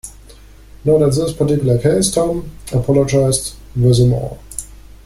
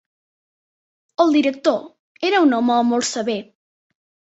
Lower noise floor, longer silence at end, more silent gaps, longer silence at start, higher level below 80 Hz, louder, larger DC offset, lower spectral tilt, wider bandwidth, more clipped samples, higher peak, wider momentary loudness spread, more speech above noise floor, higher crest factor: second, -40 dBFS vs under -90 dBFS; second, 0.3 s vs 0.9 s; second, none vs 1.99-2.15 s; second, 0.05 s vs 1.2 s; first, -36 dBFS vs -68 dBFS; first, -15 LUFS vs -19 LUFS; neither; first, -6 dB/octave vs -3.5 dB/octave; first, 15 kHz vs 8.2 kHz; neither; about the same, -2 dBFS vs -2 dBFS; first, 13 LU vs 10 LU; second, 26 dB vs over 72 dB; about the same, 14 dB vs 18 dB